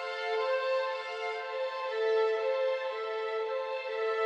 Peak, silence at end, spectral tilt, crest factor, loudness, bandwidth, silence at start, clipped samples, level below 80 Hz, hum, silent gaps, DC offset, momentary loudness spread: -20 dBFS; 0 s; 0 dB/octave; 12 dB; -32 LUFS; 8.4 kHz; 0 s; under 0.1%; -88 dBFS; none; none; under 0.1%; 6 LU